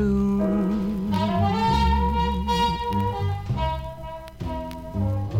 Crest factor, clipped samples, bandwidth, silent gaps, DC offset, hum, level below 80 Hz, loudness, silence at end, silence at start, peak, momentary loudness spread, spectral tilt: 14 dB; under 0.1%; 16 kHz; none; under 0.1%; none; -32 dBFS; -24 LUFS; 0 s; 0 s; -10 dBFS; 11 LU; -7.5 dB/octave